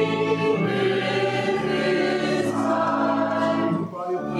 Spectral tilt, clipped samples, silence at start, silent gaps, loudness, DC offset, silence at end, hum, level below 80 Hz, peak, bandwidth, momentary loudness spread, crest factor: -6 dB/octave; under 0.1%; 0 s; none; -23 LUFS; under 0.1%; 0 s; none; -60 dBFS; -10 dBFS; 12.5 kHz; 2 LU; 14 dB